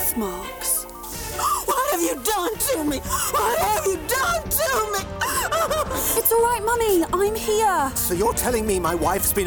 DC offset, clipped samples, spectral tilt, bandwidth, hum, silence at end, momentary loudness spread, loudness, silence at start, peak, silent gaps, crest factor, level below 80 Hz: under 0.1%; under 0.1%; -3 dB/octave; over 20 kHz; none; 0 s; 5 LU; -21 LUFS; 0 s; -8 dBFS; none; 14 dB; -38 dBFS